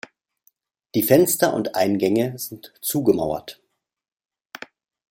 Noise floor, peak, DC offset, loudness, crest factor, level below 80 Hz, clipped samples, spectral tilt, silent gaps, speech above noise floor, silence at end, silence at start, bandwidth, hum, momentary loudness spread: -65 dBFS; -2 dBFS; under 0.1%; -21 LUFS; 22 dB; -60 dBFS; under 0.1%; -5 dB/octave; none; 44 dB; 1.6 s; 0.95 s; 16.5 kHz; none; 23 LU